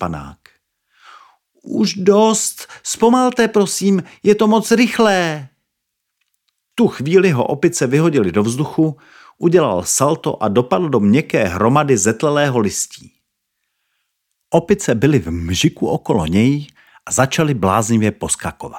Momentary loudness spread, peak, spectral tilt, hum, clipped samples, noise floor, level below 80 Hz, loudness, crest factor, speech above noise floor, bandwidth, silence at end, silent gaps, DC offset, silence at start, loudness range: 8 LU; 0 dBFS; -5 dB/octave; none; under 0.1%; -76 dBFS; -48 dBFS; -16 LUFS; 16 dB; 60 dB; 17 kHz; 0 s; none; under 0.1%; 0 s; 4 LU